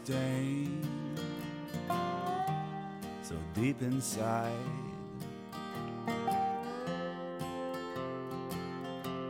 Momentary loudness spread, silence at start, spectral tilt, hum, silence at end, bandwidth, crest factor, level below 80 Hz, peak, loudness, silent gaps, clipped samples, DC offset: 9 LU; 0 s; -5.5 dB/octave; none; 0 s; 16 kHz; 16 dB; -64 dBFS; -20 dBFS; -37 LUFS; none; under 0.1%; under 0.1%